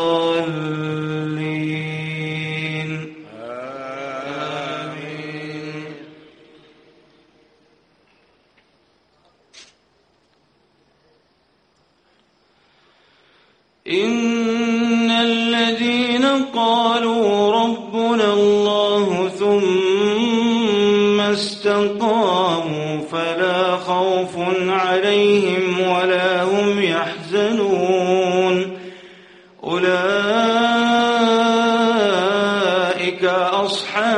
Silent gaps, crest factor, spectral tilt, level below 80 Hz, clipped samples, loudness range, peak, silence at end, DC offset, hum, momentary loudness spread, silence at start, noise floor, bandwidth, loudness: none; 16 dB; -5 dB/octave; -64 dBFS; under 0.1%; 13 LU; -4 dBFS; 0 s; under 0.1%; none; 13 LU; 0 s; -61 dBFS; 10.5 kHz; -18 LUFS